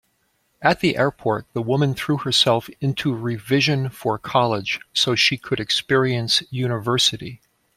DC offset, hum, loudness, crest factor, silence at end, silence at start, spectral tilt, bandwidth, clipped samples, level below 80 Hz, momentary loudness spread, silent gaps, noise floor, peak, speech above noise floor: under 0.1%; none; -20 LUFS; 20 dB; 0.4 s; 0.6 s; -4.5 dB/octave; 15.5 kHz; under 0.1%; -56 dBFS; 8 LU; none; -67 dBFS; -2 dBFS; 46 dB